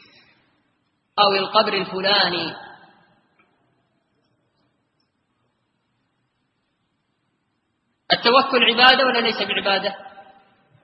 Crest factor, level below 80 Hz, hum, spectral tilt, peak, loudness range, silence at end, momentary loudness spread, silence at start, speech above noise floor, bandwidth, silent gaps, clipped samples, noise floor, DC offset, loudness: 24 dB; -66 dBFS; none; -5.5 dB/octave; 0 dBFS; 8 LU; 0.6 s; 16 LU; 1.15 s; 53 dB; 8 kHz; none; under 0.1%; -72 dBFS; under 0.1%; -17 LUFS